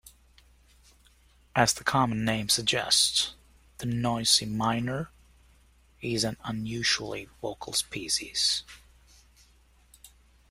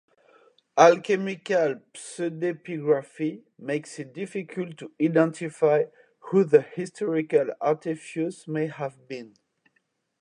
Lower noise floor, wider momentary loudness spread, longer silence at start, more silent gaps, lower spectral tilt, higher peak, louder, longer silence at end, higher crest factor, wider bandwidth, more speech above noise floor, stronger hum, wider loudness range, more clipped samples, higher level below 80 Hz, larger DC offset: second, -61 dBFS vs -73 dBFS; about the same, 14 LU vs 15 LU; second, 0.05 s vs 0.75 s; neither; second, -2.5 dB/octave vs -6 dB/octave; second, -6 dBFS vs -2 dBFS; about the same, -27 LUFS vs -25 LUFS; second, 0.45 s vs 0.95 s; about the same, 24 dB vs 22 dB; first, 16 kHz vs 11 kHz; second, 33 dB vs 48 dB; neither; about the same, 6 LU vs 5 LU; neither; first, -56 dBFS vs -80 dBFS; neither